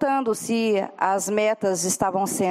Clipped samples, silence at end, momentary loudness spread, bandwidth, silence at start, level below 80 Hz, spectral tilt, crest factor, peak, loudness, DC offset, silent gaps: under 0.1%; 0 s; 2 LU; 16 kHz; 0 s; -62 dBFS; -4 dB/octave; 18 dB; -6 dBFS; -23 LUFS; under 0.1%; none